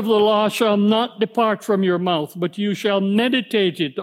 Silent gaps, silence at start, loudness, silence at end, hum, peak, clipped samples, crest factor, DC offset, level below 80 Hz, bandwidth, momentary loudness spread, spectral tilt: none; 0 s; -19 LUFS; 0 s; none; -4 dBFS; under 0.1%; 14 dB; under 0.1%; -74 dBFS; 15.5 kHz; 6 LU; -5.5 dB/octave